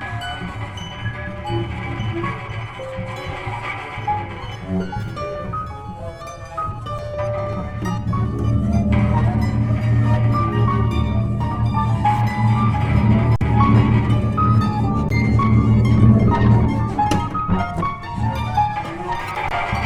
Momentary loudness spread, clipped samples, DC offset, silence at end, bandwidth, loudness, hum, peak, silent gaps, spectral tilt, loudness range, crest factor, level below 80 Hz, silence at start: 13 LU; under 0.1%; under 0.1%; 0 s; 8.4 kHz; -20 LUFS; none; 0 dBFS; none; -8 dB/octave; 11 LU; 18 dB; -30 dBFS; 0 s